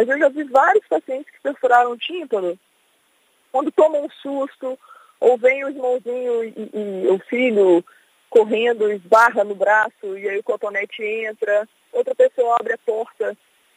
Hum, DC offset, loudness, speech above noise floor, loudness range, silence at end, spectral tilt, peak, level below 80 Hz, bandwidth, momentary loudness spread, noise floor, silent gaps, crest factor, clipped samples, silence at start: none; under 0.1%; -19 LUFS; 43 dB; 4 LU; 0.45 s; -5 dB/octave; -2 dBFS; -78 dBFS; 15 kHz; 12 LU; -61 dBFS; none; 18 dB; under 0.1%; 0 s